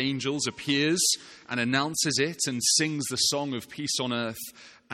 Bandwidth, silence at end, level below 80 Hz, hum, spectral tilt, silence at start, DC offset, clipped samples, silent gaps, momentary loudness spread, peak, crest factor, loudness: 16 kHz; 0 s; -66 dBFS; none; -2.5 dB/octave; 0 s; under 0.1%; under 0.1%; none; 11 LU; -10 dBFS; 18 dB; -26 LUFS